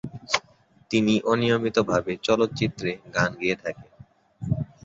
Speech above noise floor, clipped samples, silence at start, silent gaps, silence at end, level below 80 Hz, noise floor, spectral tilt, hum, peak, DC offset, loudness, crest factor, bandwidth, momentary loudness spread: 34 dB; under 0.1%; 0.05 s; none; 0.2 s; -54 dBFS; -58 dBFS; -5.5 dB/octave; none; -4 dBFS; under 0.1%; -25 LUFS; 22 dB; 8 kHz; 9 LU